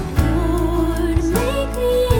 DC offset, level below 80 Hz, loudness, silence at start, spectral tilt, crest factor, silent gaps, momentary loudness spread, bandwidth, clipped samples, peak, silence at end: under 0.1%; -24 dBFS; -19 LUFS; 0 s; -6.5 dB/octave; 16 dB; none; 1 LU; 19 kHz; under 0.1%; -2 dBFS; 0 s